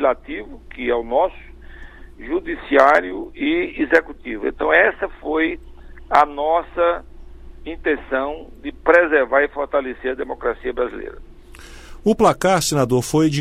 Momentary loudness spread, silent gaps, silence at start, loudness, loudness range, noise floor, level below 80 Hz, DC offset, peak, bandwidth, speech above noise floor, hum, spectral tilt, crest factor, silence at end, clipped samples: 16 LU; none; 0 s; -19 LUFS; 3 LU; -39 dBFS; -40 dBFS; under 0.1%; 0 dBFS; 16 kHz; 21 dB; none; -5 dB/octave; 20 dB; 0 s; under 0.1%